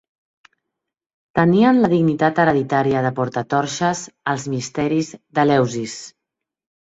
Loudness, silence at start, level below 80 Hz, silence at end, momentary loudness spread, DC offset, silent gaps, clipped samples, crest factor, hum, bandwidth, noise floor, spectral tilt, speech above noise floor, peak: -19 LUFS; 1.35 s; -56 dBFS; 0.75 s; 10 LU; under 0.1%; none; under 0.1%; 18 dB; none; 8 kHz; -82 dBFS; -6 dB/octave; 64 dB; -2 dBFS